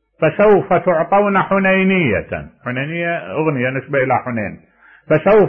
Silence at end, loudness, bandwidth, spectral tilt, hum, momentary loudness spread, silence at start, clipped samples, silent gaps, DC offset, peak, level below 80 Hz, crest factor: 0 s; -16 LUFS; 3.6 kHz; -10 dB/octave; none; 11 LU; 0.2 s; under 0.1%; none; under 0.1%; -4 dBFS; -46 dBFS; 12 dB